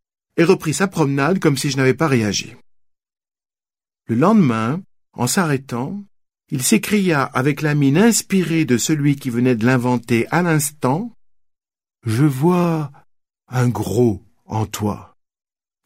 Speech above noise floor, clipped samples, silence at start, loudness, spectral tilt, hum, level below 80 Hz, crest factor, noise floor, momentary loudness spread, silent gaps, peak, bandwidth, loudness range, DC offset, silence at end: over 73 dB; under 0.1%; 0.35 s; -18 LUFS; -5.5 dB/octave; none; -56 dBFS; 18 dB; under -90 dBFS; 11 LU; none; -2 dBFS; 16 kHz; 4 LU; 0.1%; 0.8 s